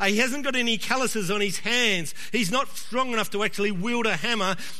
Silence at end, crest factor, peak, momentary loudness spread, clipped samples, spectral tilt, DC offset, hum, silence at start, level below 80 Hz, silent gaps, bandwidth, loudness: 0 s; 20 dB; -6 dBFS; 5 LU; under 0.1%; -3 dB/octave; 3%; none; 0 s; -64 dBFS; none; 13.5 kHz; -25 LUFS